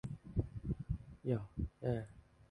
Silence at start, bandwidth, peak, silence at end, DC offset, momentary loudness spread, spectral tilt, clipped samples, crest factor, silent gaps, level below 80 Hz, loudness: 0.05 s; 10.5 kHz; -22 dBFS; 0.3 s; under 0.1%; 5 LU; -10 dB/octave; under 0.1%; 18 dB; none; -50 dBFS; -42 LUFS